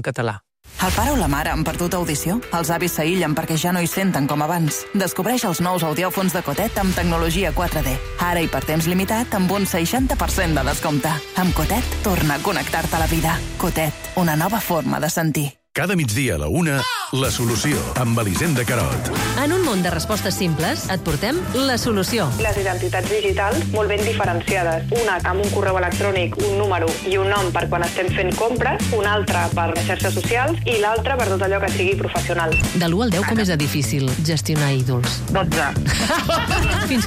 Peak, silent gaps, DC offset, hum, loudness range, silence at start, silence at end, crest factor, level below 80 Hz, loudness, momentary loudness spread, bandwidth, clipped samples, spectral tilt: -8 dBFS; none; under 0.1%; none; 1 LU; 0 s; 0 s; 10 dB; -32 dBFS; -20 LUFS; 3 LU; 16.5 kHz; under 0.1%; -4.5 dB/octave